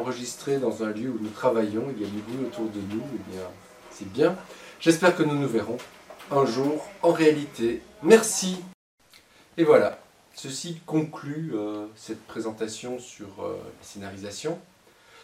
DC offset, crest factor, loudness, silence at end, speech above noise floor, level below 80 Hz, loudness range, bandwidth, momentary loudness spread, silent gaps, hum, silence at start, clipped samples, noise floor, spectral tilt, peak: under 0.1%; 24 dB; -26 LUFS; 0.6 s; 30 dB; -68 dBFS; 10 LU; 15.5 kHz; 19 LU; 8.74-8.98 s; none; 0 s; under 0.1%; -56 dBFS; -5 dB/octave; -2 dBFS